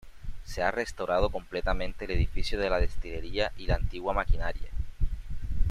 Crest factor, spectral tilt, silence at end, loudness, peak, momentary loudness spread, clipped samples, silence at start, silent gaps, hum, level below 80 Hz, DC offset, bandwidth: 16 dB; -6 dB/octave; 0 s; -32 LUFS; -10 dBFS; 11 LU; under 0.1%; 0.05 s; none; none; -32 dBFS; under 0.1%; 10.5 kHz